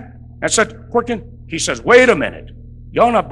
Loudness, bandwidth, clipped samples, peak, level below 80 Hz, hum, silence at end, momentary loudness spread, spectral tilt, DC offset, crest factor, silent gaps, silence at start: -15 LUFS; 12 kHz; under 0.1%; 0 dBFS; -40 dBFS; none; 0 s; 16 LU; -3.5 dB/octave; under 0.1%; 16 dB; none; 0 s